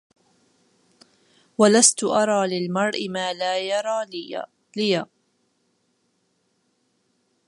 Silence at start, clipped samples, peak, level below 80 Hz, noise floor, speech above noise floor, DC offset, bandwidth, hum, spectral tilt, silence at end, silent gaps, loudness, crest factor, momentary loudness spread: 1.6 s; under 0.1%; -2 dBFS; -76 dBFS; -69 dBFS; 48 dB; under 0.1%; 11.5 kHz; none; -3 dB/octave; 2.45 s; none; -21 LUFS; 24 dB; 18 LU